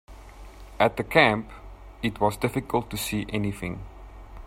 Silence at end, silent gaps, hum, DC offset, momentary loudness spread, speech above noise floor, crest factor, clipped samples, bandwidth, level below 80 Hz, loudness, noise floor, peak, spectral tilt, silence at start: 0 s; none; none; under 0.1%; 22 LU; 19 dB; 22 dB; under 0.1%; 16 kHz; -44 dBFS; -25 LUFS; -44 dBFS; -4 dBFS; -5 dB/octave; 0.1 s